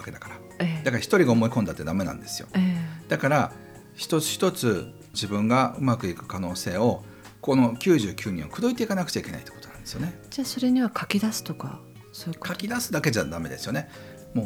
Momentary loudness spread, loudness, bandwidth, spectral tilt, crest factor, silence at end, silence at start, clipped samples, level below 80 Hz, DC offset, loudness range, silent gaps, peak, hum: 16 LU; -26 LUFS; over 20 kHz; -5.5 dB/octave; 20 dB; 0 s; 0 s; under 0.1%; -56 dBFS; under 0.1%; 4 LU; none; -6 dBFS; none